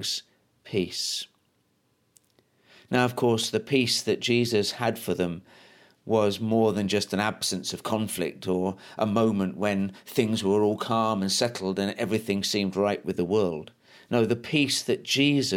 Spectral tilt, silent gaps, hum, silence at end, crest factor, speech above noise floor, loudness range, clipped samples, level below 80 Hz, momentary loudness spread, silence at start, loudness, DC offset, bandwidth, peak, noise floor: -4.5 dB/octave; none; none; 0 s; 18 dB; 44 dB; 2 LU; under 0.1%; -66 dBFS; 7 LU; 0 s; -26 LUFS; under 0.1%; 17 kHz; -8 dBFS; -70 dBFS